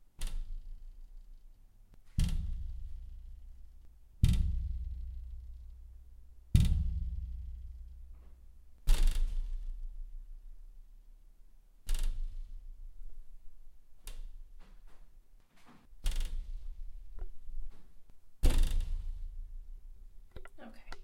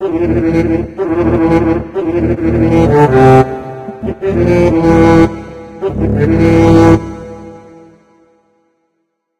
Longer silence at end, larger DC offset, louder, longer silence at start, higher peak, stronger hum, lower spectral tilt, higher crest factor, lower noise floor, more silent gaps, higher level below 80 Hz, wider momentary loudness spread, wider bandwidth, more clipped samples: second, 0 s vs 1.8 s; neither; second, -39 LUFS vs -10 LUFS; about the same, 0 s vs 0 s; second, -12 dBFS vs 0 dBFS; neither; second, -5.5 dB/octave vs -8.5 dB/octave; first, 24 dB vs 12 dB; second, -57 dBFS vs -67 dBFS; neither; second, -36 dBFS vs -28 dBFS; first, 25 LU vs 16 LU; first, 13.5 kHz vs 9.2 kHz; second, under 0.1% vs 0.5%